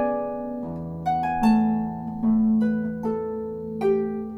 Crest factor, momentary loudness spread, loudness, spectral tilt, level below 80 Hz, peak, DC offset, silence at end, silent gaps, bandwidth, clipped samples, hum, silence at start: 14 dB; 11 LU; -25 LUFS; -8.5 dB/octave; -50 dBFS; -10 dBFS; under 0.1%; 0 s; none; 9.4 kHz; under 0.1%; none; 0 s